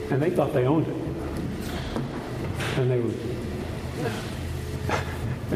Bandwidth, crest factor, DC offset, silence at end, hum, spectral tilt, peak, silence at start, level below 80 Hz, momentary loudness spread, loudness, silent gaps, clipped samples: 15.5 kHz; 20 dB; under 0.1%; 0 s; none; -6.5 dB/octave; -8 dBFS; 0 s; -40 dBFS; 9 LU; -28 LUFS; none; under 0.1%